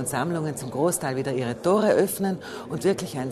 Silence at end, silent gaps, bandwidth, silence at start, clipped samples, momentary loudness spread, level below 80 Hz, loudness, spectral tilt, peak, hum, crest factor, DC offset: 0 s; none; 13.5 kHz; 0 s; under 0.1%; 8 LU; -60 dBFS; -25 LUFS; -5 dB/octave; -8 dBFS; none; 16 dB; under 0.1%